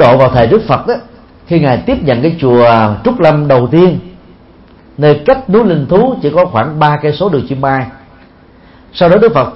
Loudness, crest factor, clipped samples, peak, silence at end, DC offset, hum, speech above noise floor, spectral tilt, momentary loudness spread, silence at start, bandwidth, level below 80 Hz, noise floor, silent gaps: -10 LUFS; 10 dB; 0.2%; 0 dBFS; 0 s; under 0.1%; none; 31 dB; -9.5 dB/octave; 7 LU; 0 s; 5.8 kHz; -36 dBFS; -40 dBFS; none